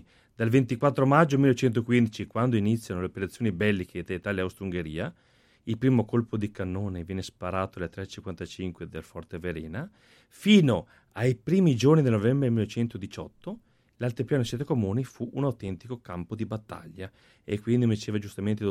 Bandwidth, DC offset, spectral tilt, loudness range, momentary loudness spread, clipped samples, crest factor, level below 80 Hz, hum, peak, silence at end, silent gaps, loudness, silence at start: 14.5 kHz; under 0.1%; -7 dB/octave; 9 LU; 18 LU; under 0.1%; 20 dB; -56 dBFS; none; -6 dBFS; 0 s; none; -27 LUFS; 0.4 s